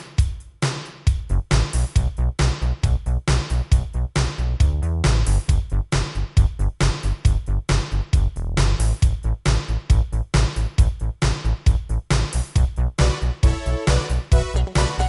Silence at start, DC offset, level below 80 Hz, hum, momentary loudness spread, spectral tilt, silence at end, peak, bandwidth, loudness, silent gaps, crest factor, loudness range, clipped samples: 0 s; under 0.1%; -20 dBFS; none; 4 LU; -5.5 dB/octave; 0 s; -4 dBFS; 11.5 kHz; -22 LUFS; none; 16 dB; 1 LU; under 0.1%